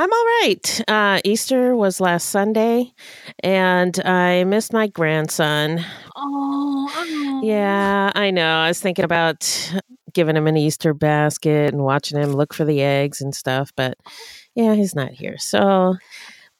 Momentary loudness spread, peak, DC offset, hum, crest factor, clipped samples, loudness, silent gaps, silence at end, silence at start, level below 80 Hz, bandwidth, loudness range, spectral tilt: 10 LU; -2 dBFS; under 0.1%; none; 16 dB; under 0.1%; -19 LUFS; none; 0.3 s; 0 s; -62 dBFS; 17 kHz; 3 LU; -4.5 dB/octave